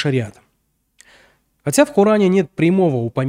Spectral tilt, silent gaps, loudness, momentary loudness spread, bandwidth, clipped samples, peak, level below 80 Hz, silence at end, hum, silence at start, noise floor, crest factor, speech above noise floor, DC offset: -6 dB/octave; none; -16 LUFS; 10 LU; 16 kHz; under 0.1%; 0 dBFS; -58 dBFS; 0 s; none; 0 s; -67 dBFS; 18 dB; 51 dB; under 0.1%